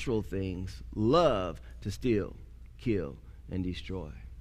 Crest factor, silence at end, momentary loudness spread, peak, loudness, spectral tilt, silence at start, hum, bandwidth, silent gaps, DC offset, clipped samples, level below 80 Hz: 20 dB; 0 s; 17 LU; -12 dBFS; -32 LUFS; -7 dB/octave; 0 s; none; 15.5 kHz; none; under 0.1%; under 0.1%; -46 dBFS